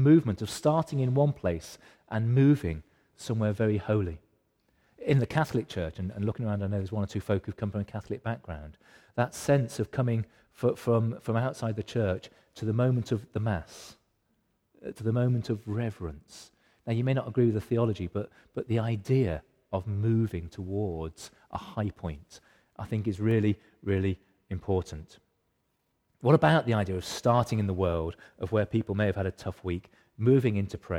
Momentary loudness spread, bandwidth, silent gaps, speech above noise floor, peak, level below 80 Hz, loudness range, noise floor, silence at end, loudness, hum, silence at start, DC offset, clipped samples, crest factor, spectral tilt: 16 LU; 15.5 kHz; none; 48 dB; -8 dBFS; -52 dBFS; 5 LU; -76 dBFS; 0 s; -29 LUFS; none; 0 s; under 0.1%; under 0.1%; 22 dB; -7.5 dB/octave